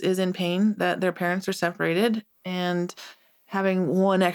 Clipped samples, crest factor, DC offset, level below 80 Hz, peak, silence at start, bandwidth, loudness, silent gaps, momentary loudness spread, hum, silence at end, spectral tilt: under 0.1%; 18 dB; under 0.1%; -78 dBFS; -8 dBFS; 0 s; 19 kHz; -25 LUFS; none; 10 LU; none; 0 s; -6 dB/octave